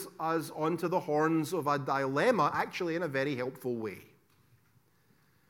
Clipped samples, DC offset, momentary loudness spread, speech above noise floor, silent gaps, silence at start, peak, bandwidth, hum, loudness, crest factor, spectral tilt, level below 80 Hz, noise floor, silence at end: under 0.1%; under 0.1%; 9 LU; 37 dB; none; 0 s; -14 dBFS; 17.5 kHz; none; -31 LUFS; 18 dB; -6 dB/octave; -78 dBFS; -68 dBFS; 1.45 s